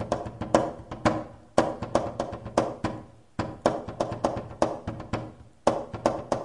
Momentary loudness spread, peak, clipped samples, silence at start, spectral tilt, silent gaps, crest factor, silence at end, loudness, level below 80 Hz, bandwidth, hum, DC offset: 9 LU; -4 dBFS; under 0.1%; 0 s; -6 dB/octave; none; 26 dB; 0 s; -29 LUFS; -50 dBFS; 11.5 kHz; none; 0.1%